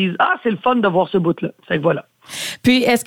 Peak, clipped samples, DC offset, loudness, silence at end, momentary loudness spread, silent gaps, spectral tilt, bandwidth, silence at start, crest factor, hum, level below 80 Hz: -2 dBFS; under 0.1%; under 0.1%; -18 LUFS; 0.05 s; 10 LU; none; -5 dB/octave; 17.5 kHz; 0 s; 14 dB; none; -56 dBFS